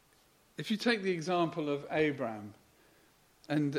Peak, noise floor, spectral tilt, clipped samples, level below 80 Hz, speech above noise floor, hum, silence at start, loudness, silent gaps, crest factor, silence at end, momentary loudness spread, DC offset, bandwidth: -16 dBFS; -66 dBFS; -6 dB/octave; under 0.1%; -74 dBFS; 34 dB; none; 0.6 s; -33 LUFS; none; 20 dB; 0 s; 14 LU; under 0.1%; 15.5 kHz